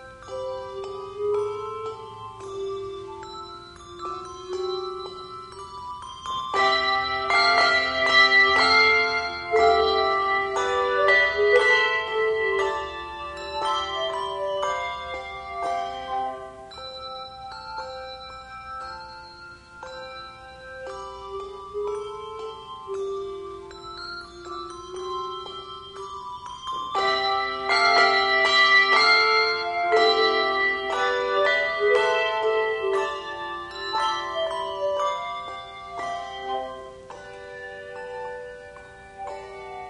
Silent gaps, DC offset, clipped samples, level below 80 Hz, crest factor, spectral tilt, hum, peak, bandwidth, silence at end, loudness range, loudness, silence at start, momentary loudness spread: none; under 0.1%; under 0.1%; -54 dBFS; 20 dB; -2 dB/octave; 60 Hz at -65 dBFS; -6 dBFS; 10.5 kHz; 0 s; 17 LU; -22 LUFS; 0 s; 21 LU